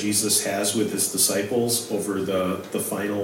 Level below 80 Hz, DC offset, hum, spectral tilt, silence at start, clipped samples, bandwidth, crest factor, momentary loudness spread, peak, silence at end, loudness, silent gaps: -68 dBFS; under 0.1%; none; -3 dB/octave; 0 s; under 0.1%; 16.5 kHz; 16 dB; 7 LU; -8 dBFS; 0 s; -23 LUFS; none